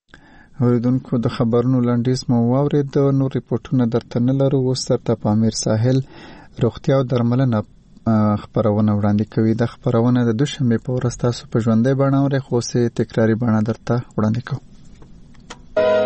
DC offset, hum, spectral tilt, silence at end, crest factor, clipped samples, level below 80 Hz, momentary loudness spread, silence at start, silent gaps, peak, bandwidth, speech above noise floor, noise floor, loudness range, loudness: under 0.1%; none; -7 dB/octave; 0 s; 12 dB; under 0.1%; -46 dBFS; 6 LU; 0.6 s; none; -8 dBFS; 8.4 kHz; 29 dB; -46 dBFS; 1 LU; -19 LUFS